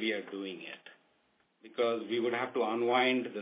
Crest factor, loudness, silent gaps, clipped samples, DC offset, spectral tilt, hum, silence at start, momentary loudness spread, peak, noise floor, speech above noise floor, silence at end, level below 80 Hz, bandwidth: 18 dB; -32 LUFS; none; under 0.1%; under 0.1%; -1.5 dB/octave; none; 0 s; 17 LU; -14 dBFS; -73 dBFS; 40 dB; 0 s; under -90 dBFS; 4 kHz